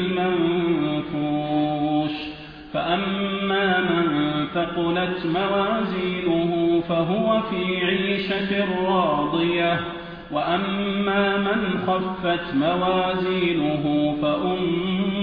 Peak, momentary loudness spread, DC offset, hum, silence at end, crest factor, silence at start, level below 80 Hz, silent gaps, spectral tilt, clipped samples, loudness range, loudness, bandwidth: -8 dBFS; 4 LU; under 0.1%; none; 0 s; 14 dB; 0 s; -50 dBFS; none; -9 dB/octave; under 0.1%; 1 LU; -22 LUFS; 5.2 kHz